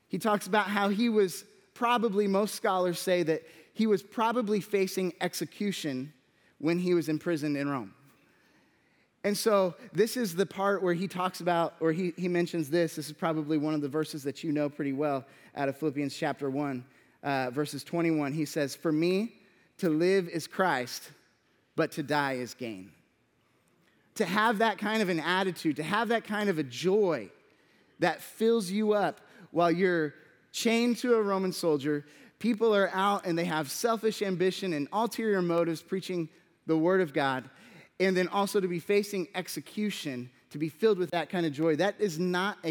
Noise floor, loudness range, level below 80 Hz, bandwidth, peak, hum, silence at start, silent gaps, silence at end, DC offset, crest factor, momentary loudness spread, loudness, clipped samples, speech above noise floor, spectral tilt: -70 dBFS; 4 LU; -84 dBFS; 19.5 kHz; -10 dBFS; none; 0.15 s; none; 0 s; under 0.1%; 20 dB; 9 LU; -30 LUFS; under 0.1%; 41 dB; -5 dB/octave